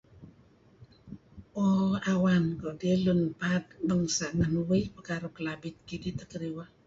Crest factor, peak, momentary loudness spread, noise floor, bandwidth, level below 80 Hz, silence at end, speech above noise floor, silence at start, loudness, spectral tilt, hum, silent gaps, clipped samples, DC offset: 14 dB; -16 dBFS; 14 LU; -60 dBFS; 7.8 kHz; -54 dBFS; 0.2 s; 31 dB; 0.2 s; -30 LUFS; -6 dB/octave; none; none; under 0.1%; under 0.1%